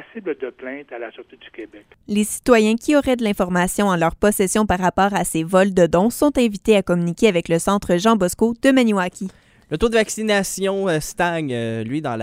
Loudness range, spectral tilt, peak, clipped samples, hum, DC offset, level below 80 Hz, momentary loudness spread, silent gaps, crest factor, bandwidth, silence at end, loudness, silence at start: 3 LU; -5 dB/octave; 0 dBFS; under 0.1%; none; under 0.1%; -42 dBFS; 14 LU; none; 18 dB; 16 kHz; 0 s; -18 LUFS; 0 s